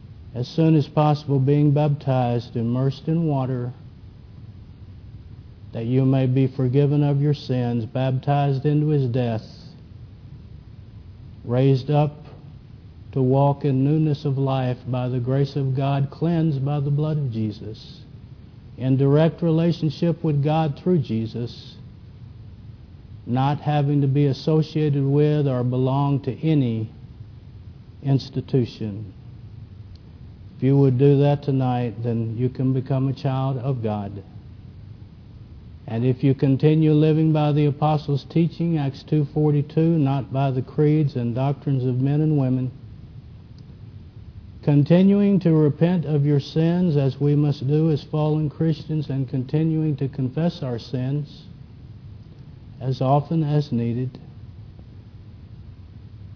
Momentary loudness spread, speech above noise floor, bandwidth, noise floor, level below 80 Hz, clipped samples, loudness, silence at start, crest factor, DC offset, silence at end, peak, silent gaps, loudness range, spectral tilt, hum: 24 LU; 22 dB; 5.4 kHz; -43 dBFS; -50 dBFS; under 0.1%; -21 LUFS; 0 s; 18 dB; under 0.1%; 0 s; -4 dBFS; none; 6 LU; -10 dB/octave; none